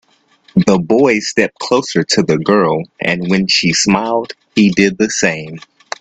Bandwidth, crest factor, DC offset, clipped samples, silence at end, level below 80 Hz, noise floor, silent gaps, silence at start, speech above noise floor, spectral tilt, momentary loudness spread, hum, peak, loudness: 9 kHz; 14 dB; under 0.1%; under 0.1%; 0.4 s; -50 dBFS; -51 dBFS; none; 0.55 s; 38 dB; -4.5 dB/octave; 8 LU; none; 0 dBFS; -13 LUFS